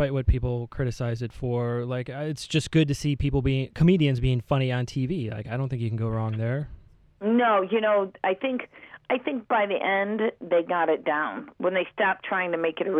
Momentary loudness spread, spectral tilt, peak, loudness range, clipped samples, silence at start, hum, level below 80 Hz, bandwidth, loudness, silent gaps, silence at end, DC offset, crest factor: 8 LU; -7 dB/octave; -8 dBFS; 2 LU; under 0.1%; 0 s; none; -40 dBFS; 11.5 kHz; -26 LUFS; none; 0 s; under 0.1%; 18 dB